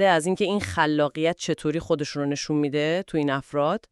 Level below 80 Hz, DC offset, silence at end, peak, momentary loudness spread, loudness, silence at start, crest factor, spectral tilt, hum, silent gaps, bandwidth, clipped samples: -56 dBFS; under 0.1%; 0.15 s; -6 dBFS; 5 LU; -25 LUFS; 0 s; 18 dB; -5 dB/octave; none; none; 12 kHz; under 0.1%